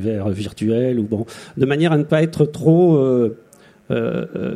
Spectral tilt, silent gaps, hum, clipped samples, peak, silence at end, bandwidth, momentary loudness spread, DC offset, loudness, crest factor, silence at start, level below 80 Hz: -8 dB/octave; none; none; under 0.1%; -2 dBFS; 0 s; 11 kHz; 10 LU; under 0.1%; -18 LUFS; 16 dB; 0 s; -54 dBFS